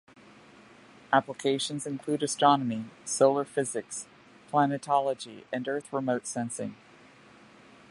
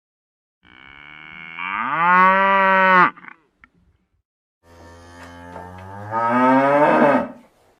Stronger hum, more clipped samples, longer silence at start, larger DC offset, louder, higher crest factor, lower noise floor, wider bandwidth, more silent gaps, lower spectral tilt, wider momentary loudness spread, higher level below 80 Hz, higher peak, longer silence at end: neither; neither; about the same, 1.1 s vs 1.2 s; neither; second, -29 LUFS vs -16 LUFS; about the same, 22 dB vs 18 dB; second, -55 dBFS vs -61 dBFS; about the same, 11.5 kHz vs 11 kHz; second, none vs 4.25-4.61 s; second, -4 dB/octave vs -6.5 dB/octave; second, 13 LU vs 24 LU; second, -76 dBFS vs -64 dBFS; second, -8 dBFS vs -2 dBFS; first, 1.15 s vs 0.45 s